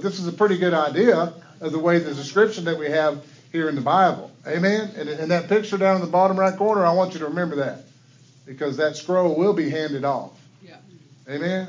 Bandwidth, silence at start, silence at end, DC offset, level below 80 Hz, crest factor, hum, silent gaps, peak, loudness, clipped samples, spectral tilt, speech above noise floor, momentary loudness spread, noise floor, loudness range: 7.6 kHz; 0 s; 0 s; under 0.1%; -74 dBFS; 18 dB; none; none; -4 dBFS; -21 LUFS; under 0.1%; -6.5 dB/octave; 31 dB; 11 LU; -52 dBFS; 4 LU